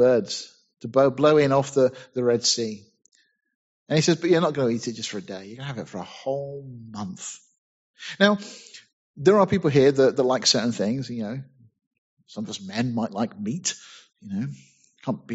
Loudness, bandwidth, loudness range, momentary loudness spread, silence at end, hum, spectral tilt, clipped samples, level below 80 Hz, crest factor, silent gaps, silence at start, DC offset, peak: -23 LUFS; 8 kHz; 9 LU; 19 LU; 0 s; none; -4.5 dB/octave; under 0.1%; -64 dBFS; 24 dB; 3.55-3.86 s, 7.58-7.94 s, 8.93-9.14 s, 11.87-11.91 s, 11.98-12.17 s; 0 s; under 0.1%; -2 dBFS